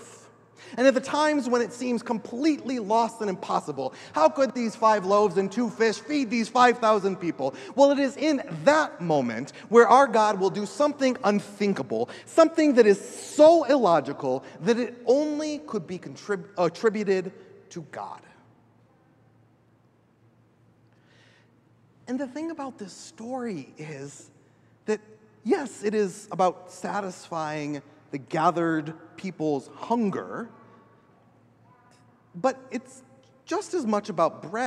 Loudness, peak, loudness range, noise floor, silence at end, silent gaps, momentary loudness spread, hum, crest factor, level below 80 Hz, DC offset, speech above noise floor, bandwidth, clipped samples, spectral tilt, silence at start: -24 LUFS; -2 dBFS; 15 LU; -62 dBFS; 0 s; none; 18 LU; none; 22 dB; -78 dBFS; under 0.1%; 37 dB; 12 kHz; under 0.1%; -5 dB/octave; 0 s